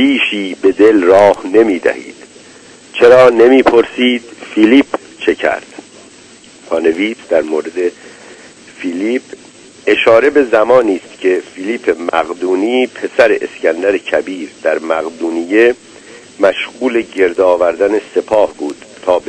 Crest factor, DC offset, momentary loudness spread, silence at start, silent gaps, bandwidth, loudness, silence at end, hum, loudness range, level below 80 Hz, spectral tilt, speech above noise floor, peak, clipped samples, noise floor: 12 dB; under 0.1%; 12 LU; 0 s; none; 11 kHz; -12 LUFS; 0.1 s; none; 8 LU; -52 dBFS; -4.5 dB/octave; 28 dB; 0 dBFS; 1%; -39 dBFS